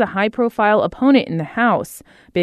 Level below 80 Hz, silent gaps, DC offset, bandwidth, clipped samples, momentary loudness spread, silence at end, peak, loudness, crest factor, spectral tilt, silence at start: -52 dBFS; none; under 0.1%; 13.5 kHz; under 0.1%; 9 LU; 0 s; -2 dBFS; -17 LUFS; 16 dB; -6 dB/octave; 0 s